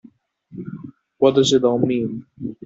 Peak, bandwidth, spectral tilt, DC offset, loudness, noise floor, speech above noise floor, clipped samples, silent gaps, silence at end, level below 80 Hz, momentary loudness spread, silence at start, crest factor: -2 dBFS; 7.8 kHz; -5.5 dB/octave; under 0.1%; -18 LUFS; -50 dBFS; 32 dB; under 0.1%; none; 0.1 s; -60 dBFS; 20 LU; 0.5 s; 18 dB